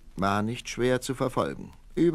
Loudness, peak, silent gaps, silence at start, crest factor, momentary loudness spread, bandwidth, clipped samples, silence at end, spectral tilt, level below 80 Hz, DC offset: -28 LUFS; -12 dBFS; none; 0.05 s; 16 dB; 7 LU; 14 kHz; under 0.1%; 0 s; -5.5 dB/octave; -48 dBFS; under 0.1%